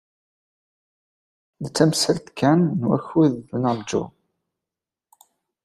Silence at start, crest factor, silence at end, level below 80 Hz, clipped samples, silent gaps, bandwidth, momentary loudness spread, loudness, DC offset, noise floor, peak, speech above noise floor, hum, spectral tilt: 1.6 s; 20 dB; 1.55 s; -60 dBFS; under 0.1%; none; 13.5 kHz; 10 LU; -21 LUFS; under 0.1%; -88 dBFS; -4 dBFS; 68 dB; none; -5.5 dB/octave